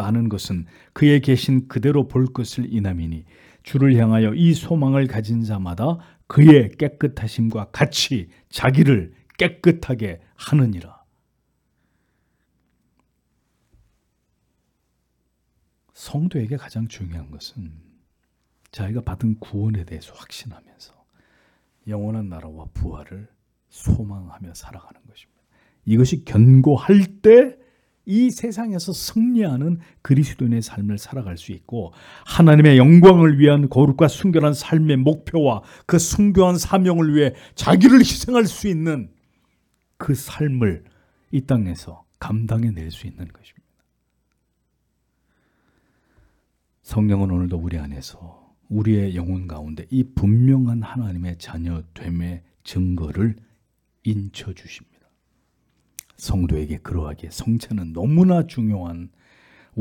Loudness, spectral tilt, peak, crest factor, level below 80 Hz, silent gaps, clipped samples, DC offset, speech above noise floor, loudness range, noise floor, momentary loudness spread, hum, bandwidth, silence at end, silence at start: -18 LUFS; -7 dB/octave; 0 dBFS; 18 dB; -42 dBFS; none; under 0.1%; under 0.1%; 52 dB; 16 LU; -70 dBFS; 21 LU; none; 18 kHz; 0 s; 0 s